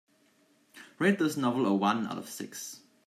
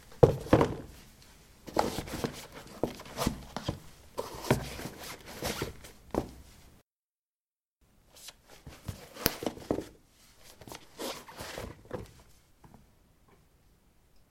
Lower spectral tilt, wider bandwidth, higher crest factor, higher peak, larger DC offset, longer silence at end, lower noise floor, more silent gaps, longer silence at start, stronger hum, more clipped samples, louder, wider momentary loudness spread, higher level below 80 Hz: about the same, -5 dB/octave vs -5.5 dB/octave; about the same, 15.5 kHz vs 16.5 kHz; second, 18 dB vs 36 dB; second, -12 dBFS vs 0 dBFS; neither; second, 0.3 s vs 1.65 s; second, -67 dBFS vs under -90 dBFS; second, none vs 6.83-6.87 s, 6.99-7.33 s, 7.40-7.45 s, 7.52-7.56 s, 7.68-7.72 s; first, 0.75 s vs 0 s; neither; neither; first, -30 LUFS vs -34 LUFS; second, 13 LU vs 24 LU; second, -80 dBFS vs -52 dBFS